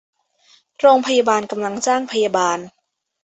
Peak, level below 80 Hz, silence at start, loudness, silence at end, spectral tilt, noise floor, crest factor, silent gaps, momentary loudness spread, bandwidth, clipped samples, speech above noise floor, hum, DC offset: -2 dBFS; -66 dBFS; 0.8 s; -18 LUFS; 0.55 s; -3 dB/octave; -56 dBFS; 18 dB; none; 7 LU; 8.2 kHz; under 0.1%; 39 dB; none; under 0.1%